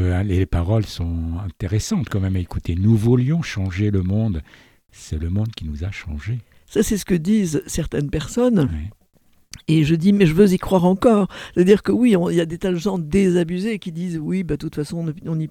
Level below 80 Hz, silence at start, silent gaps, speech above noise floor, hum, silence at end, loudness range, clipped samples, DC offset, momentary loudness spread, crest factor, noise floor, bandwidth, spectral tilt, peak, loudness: -36 dBFS; 0 s; none; 37 dB; none; 0 s; 7 LU; under 0.1%; under 0.1%; 12 LU; 18 dB; -56 dBFS; 16 kHz; -7 dB/octave; -2 dBFS; -20 LUFS